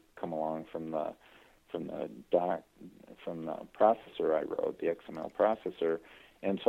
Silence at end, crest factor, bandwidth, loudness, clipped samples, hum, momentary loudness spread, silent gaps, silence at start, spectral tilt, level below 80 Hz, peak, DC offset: 0 s; 24 dB; 13.5 kHz; -34 LUFS; under 0.1%; none; 13 LU; none; 0.15 s; -7.5 dB/octave; -70 dBFS; -10 dBFS; under 0.1%